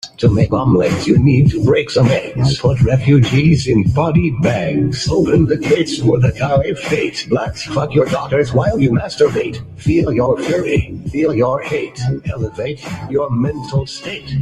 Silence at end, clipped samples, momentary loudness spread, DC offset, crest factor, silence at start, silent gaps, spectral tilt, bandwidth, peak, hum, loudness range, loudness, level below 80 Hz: 0 s; under 0.1%; 9 LU; under 0.1%; 14 dB; 0.05 s; none; -7 dB/octave; 11 kHz; -2 dBFS; none; 5 LU; -15 LUFS; -36 dBFS